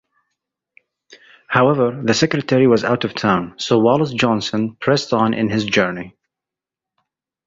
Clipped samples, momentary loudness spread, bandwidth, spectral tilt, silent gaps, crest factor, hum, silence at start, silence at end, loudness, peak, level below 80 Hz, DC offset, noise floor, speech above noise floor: under 0.1%; 6 LU; 7.8 kHz; -5.5 dB/octave; none; 18 dB; none; 1.1 s; 1.35 s; -17 LUFS; 0 dBFS; -54 dBFS; under 0.1%; -87 dBFS; 70 dB